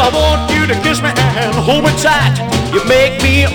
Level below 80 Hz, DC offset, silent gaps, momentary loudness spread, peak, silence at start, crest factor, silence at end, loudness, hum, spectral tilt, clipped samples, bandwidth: -24 dBFS; 0.2%; none; 4 LU; 0 dBFS; 0 s; 12 dB; 0 s; -12 LUFS; none; -4.5 dB/octave; under 0.1%; 19 kHz